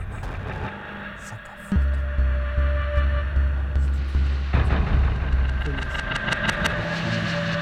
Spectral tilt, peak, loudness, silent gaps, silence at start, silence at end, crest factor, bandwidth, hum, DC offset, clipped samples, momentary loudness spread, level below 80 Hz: -6 dB/octave; -6 dBFS; -25 LUFS; none; 0 s; 0 s; 16 dB; 9.4 kHz; none; under 0.1%; under 0.1%; 10 LU; -24 dBFS